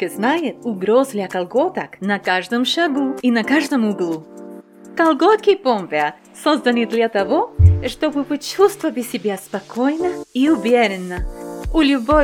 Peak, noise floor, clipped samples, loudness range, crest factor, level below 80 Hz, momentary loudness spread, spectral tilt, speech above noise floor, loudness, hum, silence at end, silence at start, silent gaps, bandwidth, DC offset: 0 dBFS; -38 dBFS; under 0.1%; 2 LU; 18 dB; -34 dBFS; 11 LU; -6 dB/octave; 20 dB; -18 LUFS; none; 0 s; 0 s; none; 16 kHz; under 0.1%